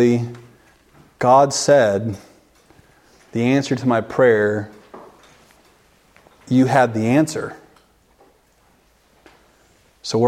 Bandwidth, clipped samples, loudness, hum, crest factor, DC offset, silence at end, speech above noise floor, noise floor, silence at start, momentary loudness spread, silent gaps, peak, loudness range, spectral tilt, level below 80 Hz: 15 kHz; under 0.1%; -17 LUFS; none; 20 dB; under 0.1%; 0 s; 41 dB; -57 dBFS; 0 s; 16 LU; none; 0 dBFS; 3 LU; -5.5 dB/octave; -60 dBFS